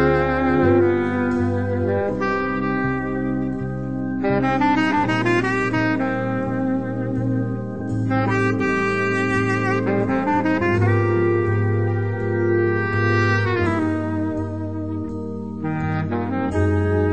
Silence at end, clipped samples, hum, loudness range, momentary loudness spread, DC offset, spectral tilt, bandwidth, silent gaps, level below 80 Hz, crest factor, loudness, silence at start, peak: 0 s; under 0.1%; none; 3 LU; 8 LU; 0.9%; -8 dB/octave; 8.8 kHz; none; -44 dBFS; 14 dB; -21 LUFS; 0 s; -4 dBFS